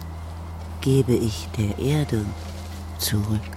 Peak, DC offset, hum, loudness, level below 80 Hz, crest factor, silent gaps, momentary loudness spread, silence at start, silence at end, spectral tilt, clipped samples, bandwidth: -6 dBFS; under 0.1%; none; -24 LUFS; -38 dBFS; 18 dB; none; 15 LU; 0 s; 0 s; -6 dB/octave; under 0.1%; 16 kHz